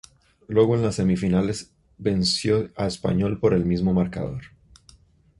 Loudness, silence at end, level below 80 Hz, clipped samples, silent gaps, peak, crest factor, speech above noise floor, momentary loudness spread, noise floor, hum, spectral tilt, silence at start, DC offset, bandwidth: -23 LUFS; 0.95 s; -44 dBFS; under 0.1%; none; -6 dBFS; 18 dB; 33 dB; 9 LU; -55 dBFS; none; -6 dB/octave; 0.5 s; under 0.1%; 11.5 kHz